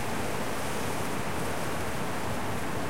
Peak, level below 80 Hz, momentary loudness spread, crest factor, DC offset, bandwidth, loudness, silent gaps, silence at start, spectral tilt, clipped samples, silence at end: -18 dBFS; -48 dBFS; 1 LU; 12 dB; 2%; 16 kHz; -33 LUFS; none; 0 s; -4.5 dB/octave; under 0.1%; 0 s